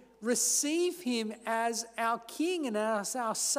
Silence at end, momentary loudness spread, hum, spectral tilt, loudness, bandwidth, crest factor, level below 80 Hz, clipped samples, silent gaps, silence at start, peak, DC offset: 0 s; 7 LU; none; -1.5 dB/octave; -31 LUFS; 16 kHz; 14 dB; -78 dBFS; under 0.1%; none; 0.2 s; -18 dBFS; under 0.1%